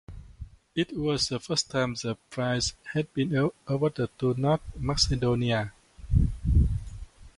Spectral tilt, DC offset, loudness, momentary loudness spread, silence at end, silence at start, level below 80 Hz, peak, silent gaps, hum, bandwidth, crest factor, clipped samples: -5 dB/octave; under 0.1%; -28 LUFS; 11 LU; 0.1 s; 0.1 s; -34 dBFS; -10 dBFS; none; none; 11.5 kHz; 18 dB; under 0.1%